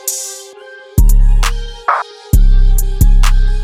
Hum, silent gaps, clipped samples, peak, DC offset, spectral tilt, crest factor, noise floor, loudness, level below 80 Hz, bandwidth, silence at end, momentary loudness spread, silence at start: none; none; under 0.1%; 0 dBFS; under 0.1%; -4 dB/octave; 10 dB; -35 dBFS; -15 LUFS; -10 dBFS; 15.5 kHz; 0 s; 11 LU; 0.05 s